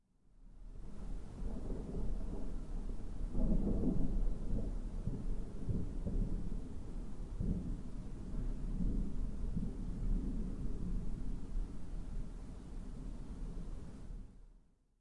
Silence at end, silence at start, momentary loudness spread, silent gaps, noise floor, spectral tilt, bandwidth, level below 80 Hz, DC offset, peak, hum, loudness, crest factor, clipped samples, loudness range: 0.45 s; 0.4 s; 11 LU; none; -65 dBFS; -9 dB/octave; 9.8 kHz; -40 dBFS; under 0.1%; -22 dBFS; none; -44 LUFS; 16 dB; under 0.1%; 7 LU